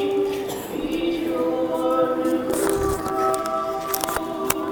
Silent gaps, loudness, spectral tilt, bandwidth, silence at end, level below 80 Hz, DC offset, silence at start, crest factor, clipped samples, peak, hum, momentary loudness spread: none; -23 LUFS; -4 dB/octave; 19.5 kHz; 0 s; -44 dBFS; under 0.1%; 0 s; 22 dB; under 0.1%; -2 dBFS; none; 5 LU